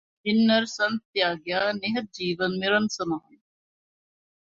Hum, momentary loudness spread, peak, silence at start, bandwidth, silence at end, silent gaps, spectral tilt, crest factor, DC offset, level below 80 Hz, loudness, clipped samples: none; 9 LU; -8 dBFS; 0.25 s; 7.6 kHz; 1.2 s; 1.05-1.14 s; -4.5 dB/octave; 18 dB; under 0.1%; -68 dBFS; -25 LUFS; under 0.1%